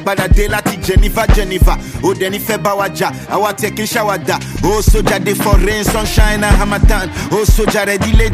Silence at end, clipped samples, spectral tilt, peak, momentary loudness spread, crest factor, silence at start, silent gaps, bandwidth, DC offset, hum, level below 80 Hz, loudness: 0 s; under 0.1%; -5 dB/octave; 0 dBFS; 5 LU; 12 dB; 0 s; none; 15.5 kHz; under 0.1%; none; -16 dBFS; -14 LUFS